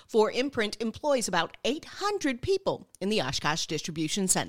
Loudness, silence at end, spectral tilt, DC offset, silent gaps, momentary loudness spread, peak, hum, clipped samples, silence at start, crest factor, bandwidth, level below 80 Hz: -29 LUFS; 0 s; -3 dB/octave; 0.3%; none; 6 LU; -8 dBFS; none; under 0.1%; 0 s; 20 dB; 16.5 kHz; -56 dBFS